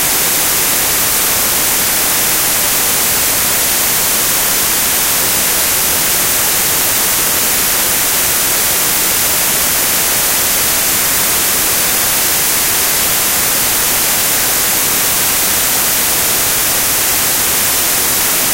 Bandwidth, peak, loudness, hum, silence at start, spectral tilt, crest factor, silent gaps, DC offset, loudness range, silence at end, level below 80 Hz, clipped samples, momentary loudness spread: 16.5 kHz; 0 dBFS; -10 LUFS; none; 0 s; 0 dB/octave; 12 dB; none; under 0.1%; 0 LU; 0 s; -38 dBFS; under 0.1%; 0 LU